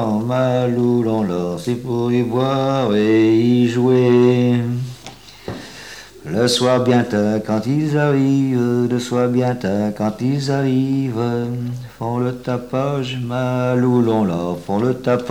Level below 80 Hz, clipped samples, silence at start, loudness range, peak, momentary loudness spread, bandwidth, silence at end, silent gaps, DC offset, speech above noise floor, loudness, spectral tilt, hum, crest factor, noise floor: -52 dBFS; under 0.1%; 0 s; 5 LU; -2 dBFS; 12 LU; 15.5 kHz; 0 s; none; 0.3%; 22 dB; -18 LUFS; -7 dB/octave; none; 14 dB; -39 dBFS